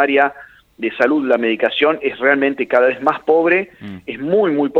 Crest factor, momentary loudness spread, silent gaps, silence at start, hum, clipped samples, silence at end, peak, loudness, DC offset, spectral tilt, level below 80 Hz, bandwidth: 16 dB; 11 LU; none; 0 s; none; under 0.1%; 0 s; 0 dBFS; -16 LUFS; under 0.1%; -6.5 dB/octave; -60 dBFS; 6.8 kHz